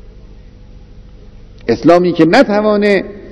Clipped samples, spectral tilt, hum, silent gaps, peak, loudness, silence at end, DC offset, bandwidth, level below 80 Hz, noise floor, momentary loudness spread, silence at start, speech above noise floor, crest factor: 1%; -6.5 dB/octave; 50 Hz at -40 dBFS; none; 0 dBFS; -11 LUFS; 0 s; under 0.1%; 11 kHz; -38 dBFS; -36 dBFS; 8 LU; 0.25 s; 26 dB; 14 dB